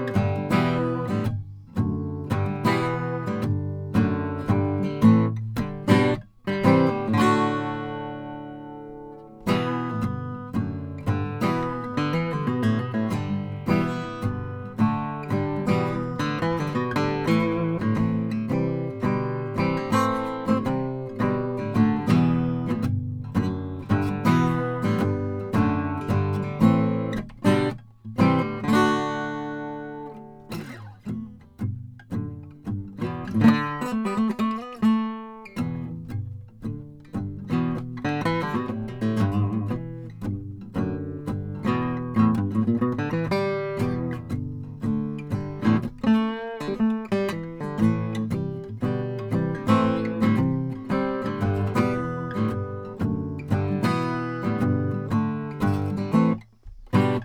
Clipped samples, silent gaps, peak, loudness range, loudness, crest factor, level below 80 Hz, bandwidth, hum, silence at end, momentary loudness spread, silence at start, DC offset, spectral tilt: under 0.1%; none; -4 dBFS; 5 LU; -25 LUFS; 20 dB; -50 dBFS; 15.5 kHz; none; 0 s; 12 LU; 0 s; under 0.1%; -8 dB/octave